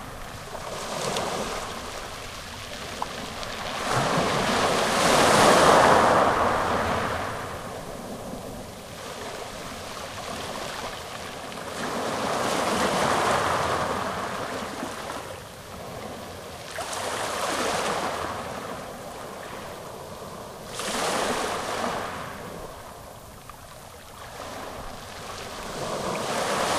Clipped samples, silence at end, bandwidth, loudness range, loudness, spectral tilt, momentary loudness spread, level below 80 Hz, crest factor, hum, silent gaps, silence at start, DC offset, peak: under 0.1%; 0 s; 16 kHz; 15 LU; -26 LUFS; -3 dB/octave; 18 LU; -48 dBFS; 22 dB; none; none; 0 s; under 0.1%; -4 dBFS